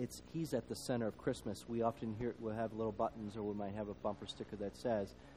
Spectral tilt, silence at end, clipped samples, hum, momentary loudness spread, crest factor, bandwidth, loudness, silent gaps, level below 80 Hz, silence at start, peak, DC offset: -6 dB/octave; 0 s; under 0.1%; none; 5 LU; 18 dB; over 20 kHz; -42 LUFS; none; -64 dBFS; 0 s; -22 dBFS; under 0.1%